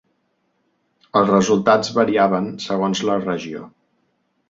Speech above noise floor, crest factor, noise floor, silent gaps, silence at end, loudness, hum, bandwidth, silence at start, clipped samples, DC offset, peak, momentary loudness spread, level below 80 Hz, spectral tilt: 50 dB; 18 dB; -68 dBFS; none; 0.8 s; -18 LUFS; none; 7.8 kHz; 1.15 s; under 0.1%; under 0.1%; -2 dBFS; 10 LU; -60 dBFS; -5.5 dB/octave